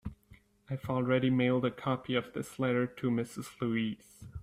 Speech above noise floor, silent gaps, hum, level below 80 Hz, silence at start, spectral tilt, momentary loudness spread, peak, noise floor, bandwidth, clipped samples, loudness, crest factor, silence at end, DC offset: 29 dB; none; none; -60 dBFS; 0.05 s; -7 dB/octave; 13 LU; -16 dBFS; -61 dBFS; 14.5 kHz; under 0.1%; -33 LUFS; 18 dB; 0 s; under 0.1%